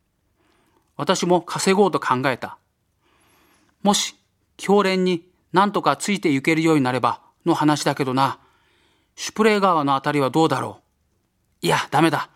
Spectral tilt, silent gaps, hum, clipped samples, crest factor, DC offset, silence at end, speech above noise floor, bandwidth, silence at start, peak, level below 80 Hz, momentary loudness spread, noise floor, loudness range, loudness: -4.5 dB/octave; none; none; under 0.1%; 20 dB; under 0.1%; 0.1 s; 48 dB; 16 kHz; 1 s; -2 dBFS; -64 dBFS; 10 LU; -68 dBFS; 3 LU; -20 LUFS